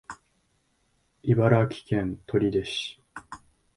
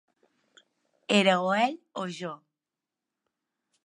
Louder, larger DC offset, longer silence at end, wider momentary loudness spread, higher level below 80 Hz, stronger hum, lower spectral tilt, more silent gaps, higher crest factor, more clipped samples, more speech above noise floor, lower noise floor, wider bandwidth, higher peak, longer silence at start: about the same, -26 LUFS vs -26 LUFS; neither; second, 0.4 s vs 1.5 s; first, 24 LU vs 20 LU; first, -54 dBFS vs -84 dBFS; neither; first, -7 dB/octave vs -4.5 dB/octave; neither; about the same, 22 dB vs 24 dB; neither; second, 46 dB vs 63 dB; second, -70 dBFS vs -89 dBFS; about the same, 11.5 kHz vs 11 kHz; about the same, -6 dBFS vs -8 dBFS; second, 0.1 s vs 1.1 s